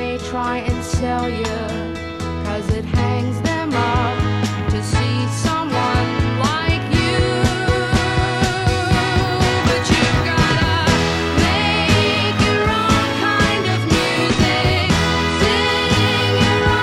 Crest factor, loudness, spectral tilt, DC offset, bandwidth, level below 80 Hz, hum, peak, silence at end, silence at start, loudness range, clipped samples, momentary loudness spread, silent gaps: 14 dB; -17 LUFS; -5 dB/octave; under 0.1%; 15.5 kHz; -30 dBFS; none; -2 dBFS; 0 s; 0 s; 5 LU; under 0.1%; 7 LU; none